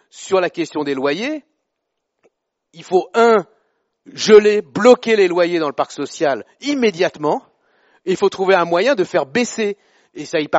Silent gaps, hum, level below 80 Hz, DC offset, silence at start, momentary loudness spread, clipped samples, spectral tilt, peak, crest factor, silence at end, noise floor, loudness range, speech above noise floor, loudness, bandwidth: none; none; -66 dBFS; under 0.1%; 0.15 s; 12 LU; under 0.1%; -3 dB/octave; 0 dBFS; 18 dB; 0 s; -76 dBFS; 6 LU; 60 dB; -16 LUFS; 8 kHz